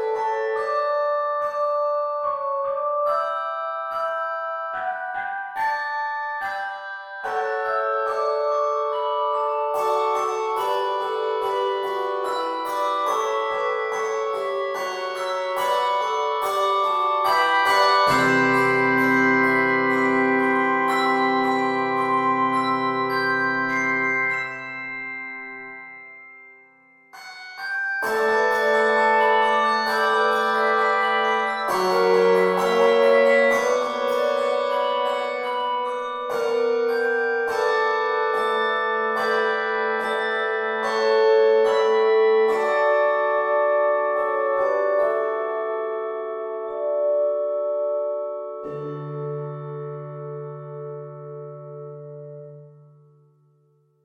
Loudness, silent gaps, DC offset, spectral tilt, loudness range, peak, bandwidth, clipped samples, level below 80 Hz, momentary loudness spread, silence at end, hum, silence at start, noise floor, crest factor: -22 LUFS; none; under 0.1%; -4.5 dB/octave; 9 LU; -6 dBFS; 17 kHz; under 0.1%; -70 dBFS; 14 LU; 1.35 s; none; 0 s; -62 dBFS; 16 dB